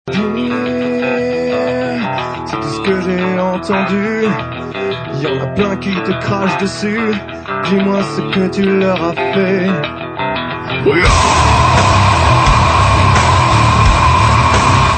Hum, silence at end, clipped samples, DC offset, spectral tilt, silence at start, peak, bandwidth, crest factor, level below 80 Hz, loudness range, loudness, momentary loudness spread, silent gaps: none; 0 s; under 0.1%; under 0.1%; -5.5 dB/octave; 0.05 s; 0 dBFS; 9.2 kHz; 12 dB; -24 dBFS; 7 LU; -13 LUFS; 10 LU; none